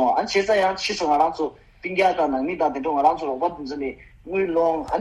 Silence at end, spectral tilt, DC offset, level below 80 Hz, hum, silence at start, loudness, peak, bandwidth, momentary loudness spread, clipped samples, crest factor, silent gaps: 0 s; -4 dB/octave; under 0.1%; -52 dBFS; none; 0 s; -22 LUFS; -6 dBFS; 12 kHz; 10 LU; under 0.1%; 16 dB; none